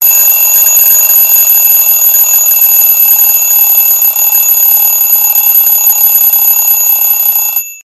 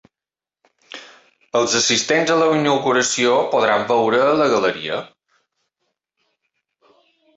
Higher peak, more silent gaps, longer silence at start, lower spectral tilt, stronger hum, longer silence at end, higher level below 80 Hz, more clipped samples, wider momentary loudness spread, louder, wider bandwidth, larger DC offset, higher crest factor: first, 0 dBFS vs -4 dBFS; neither; second, 0 s vs 0.95 s; second, 4 dB/octave vs -3 dB/octave; neither; second, 0.05 s vs 2.3 s; first, -56 dBFS vs -64 dBFS; first, 1% vs under 0.1%; second, 2 LU vs 12 LU; first, -3 LUFS vs -17 LUFS; first, over 20 kHz vs 8.4 kHz; neither; second, 6 dB vs 16 dB